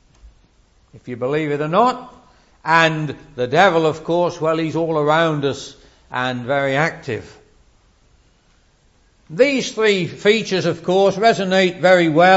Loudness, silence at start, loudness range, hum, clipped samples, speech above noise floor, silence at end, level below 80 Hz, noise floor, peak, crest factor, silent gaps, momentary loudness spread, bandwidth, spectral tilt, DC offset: -17 LUFS; 0.25 s; 7 LU; none; under 0.1%; 39 dB; 0 s; -54 dBFS; -56 dBFS; 0 dBFS; 18 dB; none; 14 LU; 8 kHz; -5 dB/octave; under 0.1%